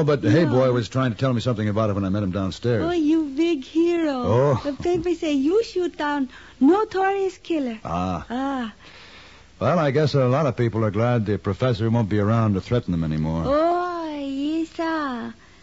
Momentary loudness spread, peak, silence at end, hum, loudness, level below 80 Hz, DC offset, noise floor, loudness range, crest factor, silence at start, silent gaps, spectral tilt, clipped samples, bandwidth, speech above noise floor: 8 LU; -8 dBFS; 0.3 s; none; -22 LUFS; -48 dBFS; 0.2%; -47 dBFS; 3 LU; 14 dB; 0 s; none; -7.5 dB/octave; under 0.1%; 8 kHz; 26 dB